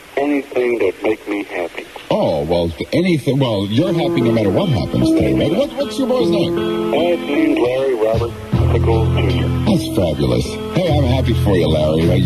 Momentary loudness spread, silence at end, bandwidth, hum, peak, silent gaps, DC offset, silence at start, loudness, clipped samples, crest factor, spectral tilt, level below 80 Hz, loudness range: 5 LU; 0 s; 13.5 kHz; none; -2 dBFS; none; 0.1%; 0 s; -17 LUFS; under 0.1%; 12 dB; -7 dB/octave; -32 dBFS; 2 LU